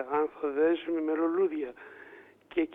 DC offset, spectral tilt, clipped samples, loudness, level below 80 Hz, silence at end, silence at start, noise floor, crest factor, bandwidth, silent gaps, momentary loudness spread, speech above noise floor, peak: under 0.1%; -7.5 dB/octave; under 0.1%; -30 LUFS; -70 dBFS; 0 s; 0 s; -53 dBFS; 12 dB; 3.8 kHz; none; 20 LU; 23 dB; -18 dBFS